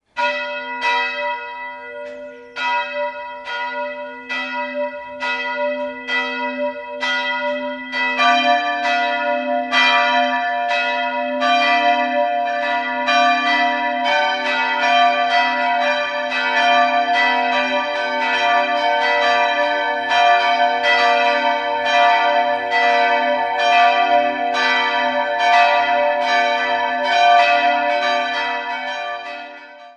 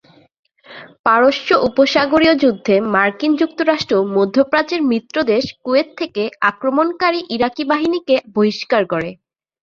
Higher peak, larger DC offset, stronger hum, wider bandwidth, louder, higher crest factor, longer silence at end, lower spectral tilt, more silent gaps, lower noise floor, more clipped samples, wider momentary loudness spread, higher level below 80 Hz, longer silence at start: about the same, -2 dBFS vs -2 dBFS; neither; neither; first, 9 kHz vs 7.4 kHz; about the same, -17 LUFS vs -16 LUFS; about the same, 16 dB vs 16 dB; second, 0.05 s vs 0.5 s; second, -1.5 dB/octave vs -5.5 dB/octave; second, none vs 0.99-1.04 s; about the same, -38 dBFS vs -39 dBFS; neither; first, 11 LU vs 6 LU; second, -66 dBFS vs -54 dBFS; second, 0.15 s vs 0.7 s